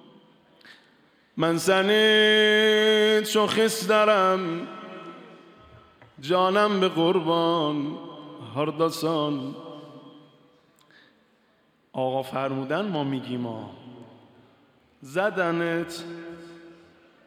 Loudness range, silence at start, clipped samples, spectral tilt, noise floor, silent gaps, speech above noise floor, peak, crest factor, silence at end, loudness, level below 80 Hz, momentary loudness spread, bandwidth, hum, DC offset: 12 LU; 0.7 s; under 0.1%; -4 dB/octave; -64 dBFS; none; 41 dB; -10 dBFS; 16 dB; 0.55 s; -23 LUFS; -74 dBFS; 22 LU; 16 kHz; none; under 0.1%